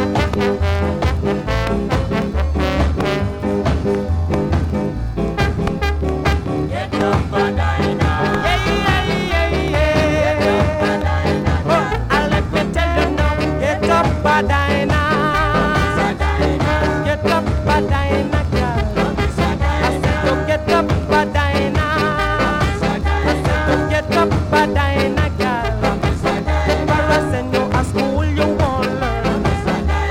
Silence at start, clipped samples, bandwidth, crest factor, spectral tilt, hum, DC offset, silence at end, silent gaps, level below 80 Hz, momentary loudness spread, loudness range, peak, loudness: 0 s; under 0.1%; 15 kHz; 16 dB; -6.5 dB/octave; none; under 0.1%; 0 s; none; -24 dBFS; 4 LU; 3 LU; 0 dBFS; -17 LUFS